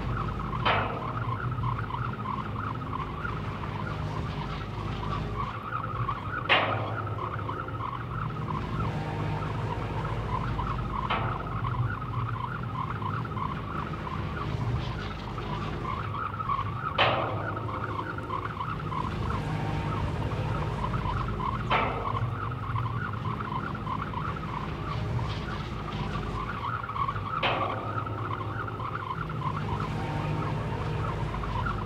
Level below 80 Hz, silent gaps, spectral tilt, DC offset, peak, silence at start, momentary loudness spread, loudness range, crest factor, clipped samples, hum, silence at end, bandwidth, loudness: -42 dBFS; none; -7 dB/octave; under 0.1%; -8 dBFS; 0 s; 6 LU; 3 LU; 22 dB; under 0.1%; none; 0 s; 10 kHz; -31 LUFS